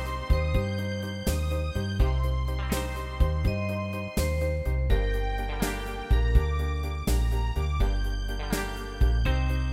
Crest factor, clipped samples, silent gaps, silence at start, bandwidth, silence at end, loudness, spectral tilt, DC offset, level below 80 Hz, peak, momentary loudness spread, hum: 16 dB; under 0.1%; none; 0 s; 16.5 kHz; 0 s; -29 LUFS; -6 dB/octave; under 0.1%; -28 dBFS; -10 dBFS; 5 LU; none